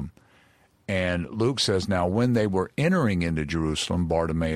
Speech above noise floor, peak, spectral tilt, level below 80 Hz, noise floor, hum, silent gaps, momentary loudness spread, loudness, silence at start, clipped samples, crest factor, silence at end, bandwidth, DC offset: 36 dB; -10 dBFS; -5.5 dB/octave; -44 dBFS; -60 dBFS; none; none; 5 LU; -25 LUFS; 0 s; under 0.1%; 14 dB; 0 s; 14 kHz; under 0.1%